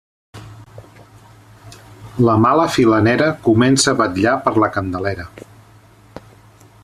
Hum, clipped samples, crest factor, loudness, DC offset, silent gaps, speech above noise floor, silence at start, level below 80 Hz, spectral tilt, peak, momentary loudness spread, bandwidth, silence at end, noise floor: none; under 0.1%; 16 dB; -15 LUFS; under 0.1%; none; 32 dB; 0.35 s; -50 dBFS; -5 dB/octave; -2 dBFS; 14 LU; 13.5 kHz; 0.65 s; -46 dBFS